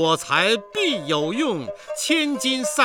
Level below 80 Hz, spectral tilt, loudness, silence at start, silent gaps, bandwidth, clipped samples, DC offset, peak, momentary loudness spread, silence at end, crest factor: -66 dBFS; -3 dB/octave; -21 LUFS; 0 s; none; 18.5 kHz; under 0.1%; under 0.1%; -4 dBFS; 8 LU; 0 s; 18 dB